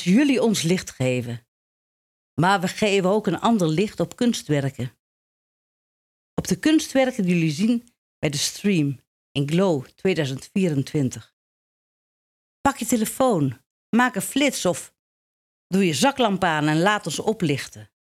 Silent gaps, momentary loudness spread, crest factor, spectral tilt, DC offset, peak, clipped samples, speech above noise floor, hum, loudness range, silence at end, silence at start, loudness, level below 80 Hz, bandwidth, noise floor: 1.48-2.37 s, 4.99-6.37 s, 7.98-8.22 s, 9.07-9.35 s, 11.33-12.64 s, 13.66-13.93 s, 14.99-15.70 s; 9 LU; 18 dB; -5 dB/octave; under 0.1%; -6 dBFS; under 0.1%; over 69 dB; none; 3 LU; 0.35 s; 0 s; -22 LUFS; -58 dBFS; 15.5 kHz; under -90 dBFS